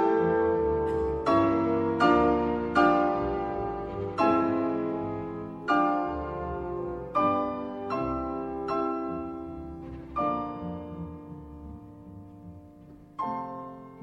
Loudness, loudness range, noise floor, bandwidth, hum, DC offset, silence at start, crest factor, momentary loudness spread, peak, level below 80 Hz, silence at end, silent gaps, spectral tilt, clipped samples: -28 LUFS; 12 LU; -50 dBFS; 8 kHz; none; under 0.1%; 0 s; 18 dB; 20 LU; -10 dBFS; -48 dBFS; 0 s; none; -8 dB/octave; under 0.1%